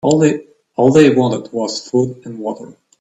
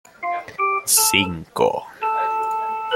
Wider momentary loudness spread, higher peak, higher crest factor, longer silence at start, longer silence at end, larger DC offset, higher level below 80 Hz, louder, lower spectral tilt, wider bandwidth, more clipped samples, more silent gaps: first, 16 LU vs 12 LU; about the same, 0 dBFS vs -2 dBFS; about the same, 16 dB vs 20 dB; second, 0.05 s vs 0.2 s; first, 0.3 s vs 0 s; neither; about the same, -56 dBFS vs -58 dBFS; first, -15 LUFS vs -20 LUFS; first, -6 dB/octave vs -1.5 dB/octave; second, 8.8 kHz vs 16.5 kHz; neither; neither